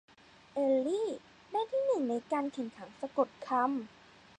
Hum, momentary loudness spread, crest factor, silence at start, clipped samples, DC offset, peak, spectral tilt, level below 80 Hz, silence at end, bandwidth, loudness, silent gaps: none; 12 LU; 20 dB; 0.55 s; under 0.1%; under 0.1%; -14 dBFS; -5 dB/octave; -78 dBFS; 0.5 s; 9.6 kHz; -34 LUFS; none